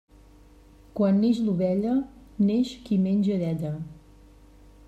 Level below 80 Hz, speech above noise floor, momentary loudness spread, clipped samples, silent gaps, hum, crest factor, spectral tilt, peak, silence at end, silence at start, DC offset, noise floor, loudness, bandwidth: -54 dBFS; 29 dB; 14 LU; under 0.1%; none; none; 14 dB; -8.5 dB/octave; -12 dBFS; 0.9 s; 0.95 s; under 0.1%; -52 dBFS; -25 LUFS; 8.4 kHz